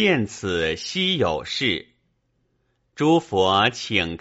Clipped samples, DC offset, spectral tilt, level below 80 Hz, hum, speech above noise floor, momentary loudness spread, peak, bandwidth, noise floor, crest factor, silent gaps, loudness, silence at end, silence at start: under 0.1%; under 0.1%; -2.5 dB/octave; -52 dBFS; none; 48 dB; 5 LU; -4 dBFS; 8 kHz; -69 dBFS; 20 dB; none; -22 LUFS; 0.05 s; 0 s